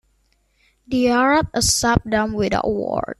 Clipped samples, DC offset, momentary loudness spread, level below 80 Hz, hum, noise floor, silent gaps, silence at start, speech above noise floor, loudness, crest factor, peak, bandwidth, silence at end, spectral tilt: under 0.1%; under 0.1%; 6 LU; -40 dBFS; none; -63 dBFS; none; 0.9 s; 44 dB; -19 LUFS; 20 dB; 0 dBFS; 13.5 kHz; 0.05 s; -3.5 dB/octave